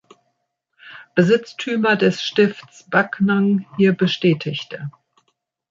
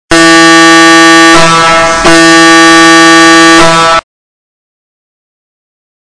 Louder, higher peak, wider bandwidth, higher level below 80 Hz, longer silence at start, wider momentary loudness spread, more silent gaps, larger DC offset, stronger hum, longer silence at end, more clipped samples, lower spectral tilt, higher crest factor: second, -18 LUFS vs -1 LUFS; about the same, -2 dBFS vs 0 dBFS; second, 7.4 kHz vs 11 kHz; second, -64 dBFS vs -32 dBFS; first, 0.85 s vs 0.1 s; first, 11 LU vs 4 LU; neither; neither; neither; second, 0.8 s vs 2.1 s; second, under 0.1% vs 20%; first, -6.5 dB/octave vs -2.5 dB/octave; first, 18 dB vs 4 dB